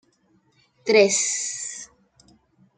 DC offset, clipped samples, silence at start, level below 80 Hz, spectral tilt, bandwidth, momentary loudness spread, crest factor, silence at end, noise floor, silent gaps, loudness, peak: under 0.1%; under 0.1%; 0.85 s; -72 dBFS; -1.5 dB/octave; 9.6 kHz; 20 LU; 22 dB; 0.95 s; -64 dBFS; none; -21 LUFS; -4 dBFS